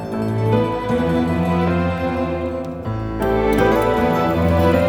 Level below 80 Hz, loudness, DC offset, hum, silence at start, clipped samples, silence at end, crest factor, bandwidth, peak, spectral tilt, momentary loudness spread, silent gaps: -34 dBFS; -19 LUFS; under 0.1%; none; 0 s; under 0.1%; 0 s; 14 dB; over 20 kHz; -4 dBFS; -7.5 dB/octave; 9 LU; none